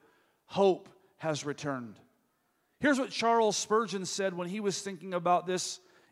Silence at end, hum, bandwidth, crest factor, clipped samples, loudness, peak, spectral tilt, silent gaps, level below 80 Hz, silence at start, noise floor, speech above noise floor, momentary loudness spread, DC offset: 0.35 s; none; 14.5 kHz; 18 dB; under 0.1%; -31 LUFS; -14 dBFS; -4 dB/octave; none; -76 dBFS; 0.5 s; -75 dBFS; 45 dB; 10 LU; under 0.1%